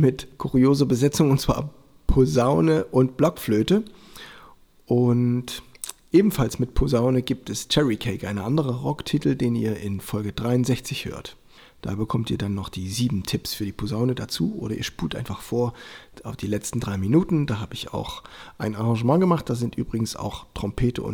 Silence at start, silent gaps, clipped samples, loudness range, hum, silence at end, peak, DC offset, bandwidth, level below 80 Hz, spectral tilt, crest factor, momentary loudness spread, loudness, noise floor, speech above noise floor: 0 s; none; under 0.1%; 6 LU; none; 0 s; -6 dBFS; under 0.1%; 20 kHz; -38 dBFS; -6.5 dB/octave; 18 dB; 14 LU; -24 LUFS; -50 dBFS; 27 dB